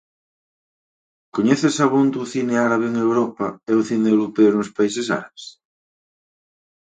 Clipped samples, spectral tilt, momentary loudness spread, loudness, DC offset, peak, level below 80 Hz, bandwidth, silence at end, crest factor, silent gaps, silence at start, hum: under 0.1%; -5.5 dB/octave; 10 LU; -19 LUFS; under 0.1%; -2 dBFS; -66 dBFS; 9.4 kHz; 1.35 s; 18 dB; none; 1.35 s; none